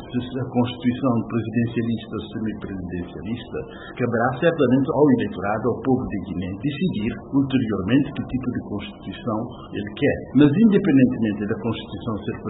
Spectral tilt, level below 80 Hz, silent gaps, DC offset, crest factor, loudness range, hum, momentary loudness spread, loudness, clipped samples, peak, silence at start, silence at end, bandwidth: -12 dB/octave; -48 dBFS; none; under 0.1%; 18 dB; 5 LU; none; 13 LU; -22 LUFS; under 0.1%; -4 dBFS; 0 s; 0 s; 4 kHz